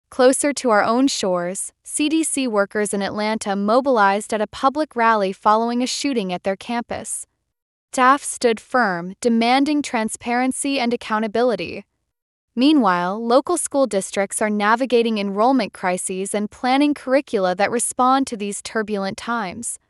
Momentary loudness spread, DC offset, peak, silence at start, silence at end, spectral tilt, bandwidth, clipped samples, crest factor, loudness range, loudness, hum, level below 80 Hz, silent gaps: 8 LU; under 0.1%; -2 dBFS; 0.1 s; 0.15 s; -3.5 dB/octave; 12 kHz; under 0.1%; 16 dB; 2 LU; -20 LUFS; none; -62 dBFS; 7.62-7.88 s, 12.22-12.48 s